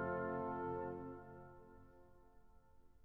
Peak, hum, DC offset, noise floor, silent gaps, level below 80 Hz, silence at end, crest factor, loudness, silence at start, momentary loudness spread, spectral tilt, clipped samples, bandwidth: -32 dBFS; none; under 0.1%; -67 dBFS; none; -70 dBFS; 0.05 s; 16 dB; -45 LUFS; 0 s; 22 LU; -8 dB/octave; under 0.1%; 5.6 kHz